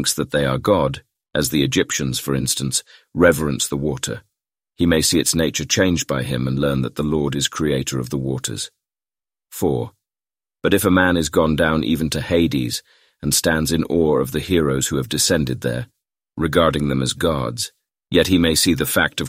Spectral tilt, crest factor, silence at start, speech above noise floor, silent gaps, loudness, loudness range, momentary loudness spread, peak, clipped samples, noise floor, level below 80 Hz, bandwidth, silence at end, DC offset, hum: -4 dB/octave; 18 dB; 0 s; over 71 dB; none; -19 LUFS; 4 LU; 10 LU; -2 dBFS; under 0.1%; under -90 dBFS; -40 dBFS; 16 kHz; 0 s; under 0.1%; none